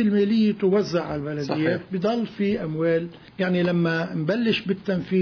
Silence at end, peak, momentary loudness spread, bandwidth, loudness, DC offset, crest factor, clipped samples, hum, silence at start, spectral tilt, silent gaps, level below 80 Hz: 0 s; -10 dBFS; 6 LU; 5.4 kHz; -24 LUFS; under 0.1%; 14 dB; under 0.1%; none; 0 s; -7.5 dB/octave; none; -58 dBFS